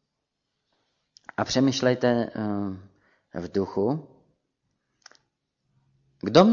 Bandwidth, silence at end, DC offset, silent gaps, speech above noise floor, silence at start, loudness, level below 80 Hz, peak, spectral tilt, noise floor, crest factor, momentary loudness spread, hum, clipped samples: 7.4 kHz; 0 s; under 0.1%; none; 58 dB; 1.4 s; -25 LUFS; -62 dBFS; -4 dBFS; -6 dB/octave; -81 dBFS; 24 dB; 15 LU; none; under 0.1%